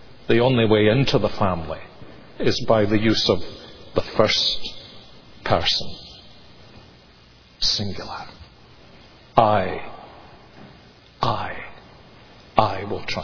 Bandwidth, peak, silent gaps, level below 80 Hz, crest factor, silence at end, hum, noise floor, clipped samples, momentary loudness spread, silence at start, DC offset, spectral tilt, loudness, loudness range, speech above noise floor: 5.4 kHz; 0 dBFS; none; -42 dBFS; 22 dB; 0 s; none; -50 dBFS; under 0.1%; 22 LU; 0 s; under 0.1%; -5 dB/octave; -21 LUFS; 8 LU; 30 dB